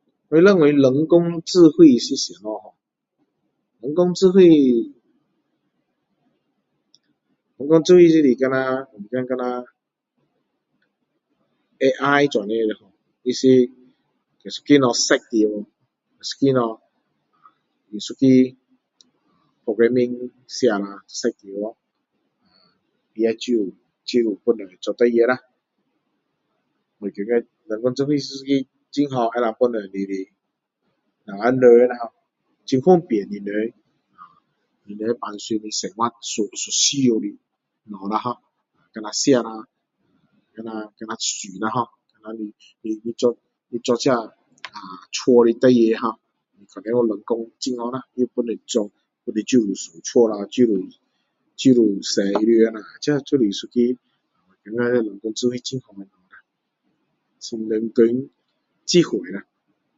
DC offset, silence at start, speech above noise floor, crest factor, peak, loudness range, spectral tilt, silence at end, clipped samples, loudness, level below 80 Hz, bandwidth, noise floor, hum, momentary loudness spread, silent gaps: under 0.1%; 0.3 s; 59 dB; 20 dB; 0 dBFS; 8 LU; -5 dB/octave; 0.55 s; under 0.1%; -19 LUFS; -70 dBFS; 7.8 kHz; -77 dBFS; none; 19 LU; none